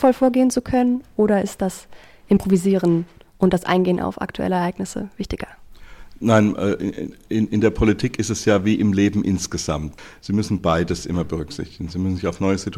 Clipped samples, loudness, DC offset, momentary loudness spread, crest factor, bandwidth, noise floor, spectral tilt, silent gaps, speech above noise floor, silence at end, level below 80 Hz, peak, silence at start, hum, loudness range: under 0.1%; -21 LUFS; 0.1%; 12 LU; 16 dB; 15 kHz; -39 dBFS; -6 dB/octave; none; 20 dB; 0 s; -40 dBFS; -4 dBFS; 0 s; none; 3 LU